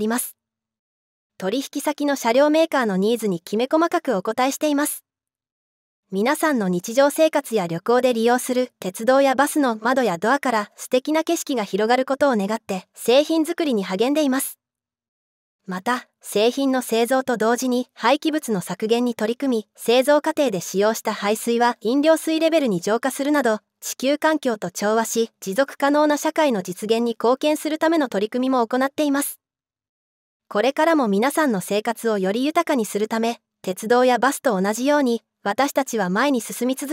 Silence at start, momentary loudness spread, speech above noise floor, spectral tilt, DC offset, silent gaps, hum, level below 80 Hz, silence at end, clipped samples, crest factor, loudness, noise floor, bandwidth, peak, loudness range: 0 s; 7 LU; over 70 dB; -4 dB/octave; under 0.1%; 0.79-1.30 s, 5.52-6.03 s, 15.08-15.59 s, 29.89-30.40 s; none; -76 dBFS; 0 s; under 0.1%; 18 dB; -21 LUFS; under -90 dBFS; 16.5 kHz; -4 dBFS; 3 LU